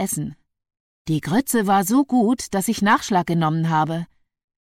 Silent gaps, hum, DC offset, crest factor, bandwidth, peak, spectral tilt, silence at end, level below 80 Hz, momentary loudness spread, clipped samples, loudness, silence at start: 0.80-1.05 s; none; under 0.1%; 14 dB; 16.5 kHz; -6 dBFS; -5 dB/octave; 0.6 s; -54 dBFS; 11 LU; under 0.1%; -20 LUFS; 0 s